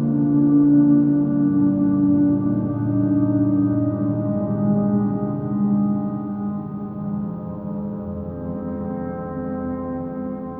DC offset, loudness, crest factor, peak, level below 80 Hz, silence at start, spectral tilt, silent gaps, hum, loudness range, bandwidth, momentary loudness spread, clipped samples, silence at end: under 0.1%; -21 LUFS; 14 dB; -6 dBFS; -48 dBFS; 0 s; -14 dB/octave; none; none; 10 LU; 2 kHz; 13 LU; under 0.1%; 0 s